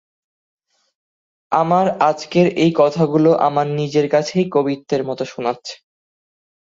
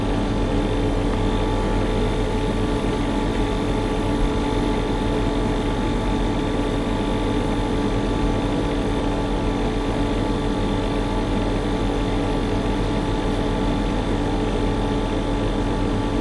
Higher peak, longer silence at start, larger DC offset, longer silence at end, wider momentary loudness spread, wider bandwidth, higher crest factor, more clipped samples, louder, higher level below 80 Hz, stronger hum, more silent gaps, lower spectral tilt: first, -2 dBFS vs -8 dBFS; first, 1.5 s vs 0 s; neither; first, 0.95 s vs 0 s; first, 9 LU vs 1 LU; second, 7.8 kHz vs 11.5 kHz; about the same, 16 dB vs 12 dB; neither; first, -17 LUFS vs -23 LUFS; second, -62 dBFS vs -26 dBFS; neither; neither; about the same, -6.5 dB/octave vs -6.5 dB/octave